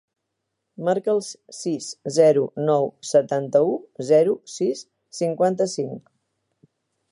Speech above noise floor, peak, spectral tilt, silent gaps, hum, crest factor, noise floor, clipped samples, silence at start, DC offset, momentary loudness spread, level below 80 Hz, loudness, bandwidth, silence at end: 58 dB; -4 dBFS; -5.5 dB/octave; none; none; 18 dB; -79 dBFS; under 0.1%; 0.8 s; under 0.1%; 12 LU; -76 dBFS; -22 LUFS; 11.5 kHz; 1.15 s